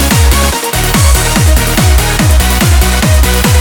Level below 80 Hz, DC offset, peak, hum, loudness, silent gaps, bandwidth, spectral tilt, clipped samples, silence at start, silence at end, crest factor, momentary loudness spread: -10 dBFS; under 0.1%; 0 dBFS; none; -9 LUFS; none; over 20 kHz; -4 dB/octave; 0.3%; 0 s; 0 s; 8 dB; 2 LU